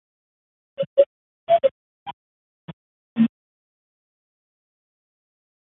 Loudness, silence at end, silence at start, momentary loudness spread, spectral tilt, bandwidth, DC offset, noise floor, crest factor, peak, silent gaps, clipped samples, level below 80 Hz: -22 LUFS; 2.35 s; 0.8 s; 20 LU; -10.5 dB/octave; 4 kHz; under 0.1%; under -90 dBFS; 24 dB; -4 dBFS; 0.87-0.96 s, 1.06-1.47 s, 1.71-2.06 s, 2.13-3.16 s; under 0.1%; -72 dBFS